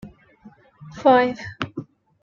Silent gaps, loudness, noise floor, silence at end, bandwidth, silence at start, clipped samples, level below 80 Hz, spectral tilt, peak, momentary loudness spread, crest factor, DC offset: none; -20 LUFS; -50 dBFS; 0.4 s; 7.2 kHz; 0.05 s; under 0.1%; -60 dBFS; -6 dB/octave; -6 dBFS; 21 LU; 18 dB; under 0.1%